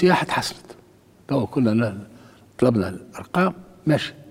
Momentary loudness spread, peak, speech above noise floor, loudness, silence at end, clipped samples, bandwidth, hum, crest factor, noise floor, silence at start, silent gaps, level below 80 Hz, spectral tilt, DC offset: 10 LU; -4 dBFS; 31 dB; -23 LUFS; 0 s; under 0.1%; 16 kHz; none; 20 dB; -52 dBFS; 0 s; none; -56 dBFS; -6.5 dB/octave; under 0.1%